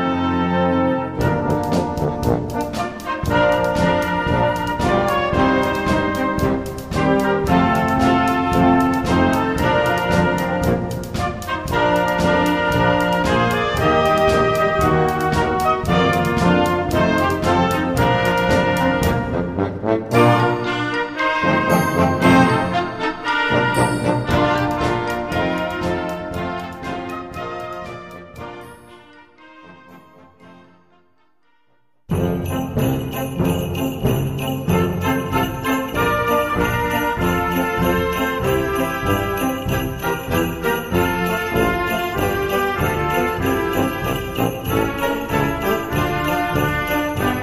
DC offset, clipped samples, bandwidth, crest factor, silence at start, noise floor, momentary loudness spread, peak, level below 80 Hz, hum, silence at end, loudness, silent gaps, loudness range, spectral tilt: 0.1%; under 0.1%; 15.5 kHz; 18 dB; 0 s; -65 dBFS; 7 LU; -2 dBFS; -36 dBFS; none; 0 s; -19 LUFS; none; 8 LU; -6 dB/octave